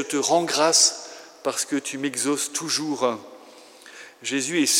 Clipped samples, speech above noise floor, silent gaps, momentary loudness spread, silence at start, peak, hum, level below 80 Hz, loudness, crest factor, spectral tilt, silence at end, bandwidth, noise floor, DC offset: under 0.1%; 24 dB; none; 19 LU; 0 s; -2 dBFS; none; -90 dBFS; -22 LUFS; 22 dB; -1.5 dB/octave; 0 s; 16.5 kHz; -47 dBFS; under 0.1%